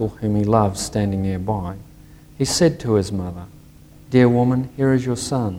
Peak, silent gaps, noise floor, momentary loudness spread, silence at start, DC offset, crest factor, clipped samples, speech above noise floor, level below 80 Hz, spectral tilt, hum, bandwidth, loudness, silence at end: -2 dBFS; none; -45 dBFS; 11 LU; 0 s; under 0.1%; 18 dB; under 0.1%; 26 dB; -44 dBFS; -6 dB/octave; none; 16.5 kHz; -20 LUFS; 0 s